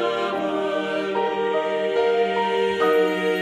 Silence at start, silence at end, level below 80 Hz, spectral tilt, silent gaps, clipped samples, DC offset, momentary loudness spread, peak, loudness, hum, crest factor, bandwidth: 0 s; 0 s; -64 dBFS; -5 dB/octave; none; under 0.1%; under 0.1%; 5 LU; -8 dBFS; -22 LUFS; none; 14 dB; 14 kHz